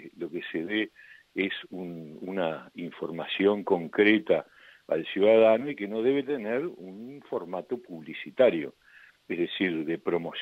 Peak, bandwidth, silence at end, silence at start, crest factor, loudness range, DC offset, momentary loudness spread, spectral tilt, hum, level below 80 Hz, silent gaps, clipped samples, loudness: -8 dBFS; 5.6 kHz; 0 s; 0 s; 20 dB; 6 LU; under 0.1%; 16 LU; -7.5 dB/octave; none; -74 dBFS; none; under 0.1%; -28 LUFS